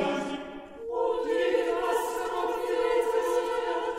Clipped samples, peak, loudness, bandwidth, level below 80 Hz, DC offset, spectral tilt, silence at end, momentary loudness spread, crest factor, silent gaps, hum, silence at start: under 0.1%; -14 dBFS; -28 LUFS; 16 kHz; -58 dBFS; under 0.1%; -4 dB/octave; 0 s; 9 LU; 14 dB; none; none; 0 s